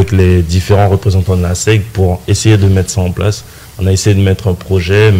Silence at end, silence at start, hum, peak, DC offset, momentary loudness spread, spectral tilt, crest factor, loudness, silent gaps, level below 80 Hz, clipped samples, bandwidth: 0 s; 0 s; none; 0 dBFS; under 0.1%; 6 LU; -6 dB/octave; 10 dB; -11 LUFS; none; -28 dBFS; under 0.1%; 15.5 kHz